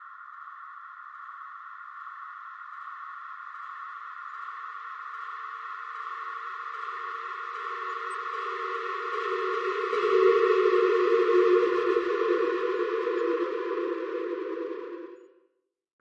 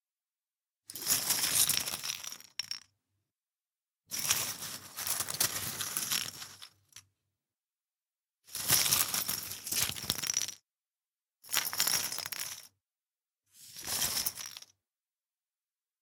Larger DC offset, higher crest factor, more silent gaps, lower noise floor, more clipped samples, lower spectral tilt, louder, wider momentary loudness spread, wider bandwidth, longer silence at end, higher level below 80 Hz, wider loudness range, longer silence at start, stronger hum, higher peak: neither; second, 18 dB vs 28 dB; neither; second, -74 dBFS vs under -90 dBFS; neither; first, -4 dB/octave vs 0.5 dB/octave; first, -28 LUFS vs -31 LUFS; first, 20 LU vs 16 LU; second, 8.6 kHz vs 19 kHz; second, 0.8 s vs 1.4 s; second, -82 dBFS vs -70 dBFS; first, 17 LU vs 6 LU; second, 0 s vs 0.9 s; neither; second, -12 dBFS vs -8 dBFS